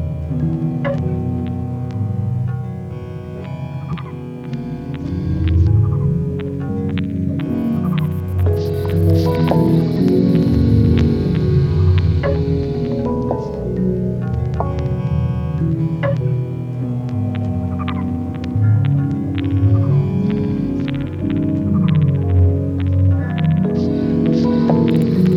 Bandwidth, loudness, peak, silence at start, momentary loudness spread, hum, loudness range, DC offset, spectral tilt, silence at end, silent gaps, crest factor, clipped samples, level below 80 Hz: 6.4 kHz; -18 LUFS; 0 dBFS; 0 s; 9 LU; none; 7 LU; under 0.1%; -10 dB/octave; 0 s; none; 16 dB; under 0.1%; -32 dBFS